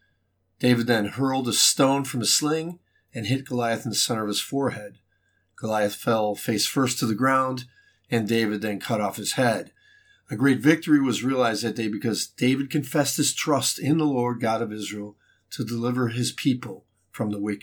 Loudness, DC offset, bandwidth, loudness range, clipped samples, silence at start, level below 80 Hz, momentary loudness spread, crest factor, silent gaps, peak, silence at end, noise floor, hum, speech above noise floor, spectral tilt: -24 LUFS; under 0.1%; over 20 kHz; 4 LU; under 0.1%; 0.6 s; -72 dBFS; 12 LU; 20 dB; none; -4 dBFS; 0.05 s; -70 dBFS; none; 46 dB; -4 dB/octave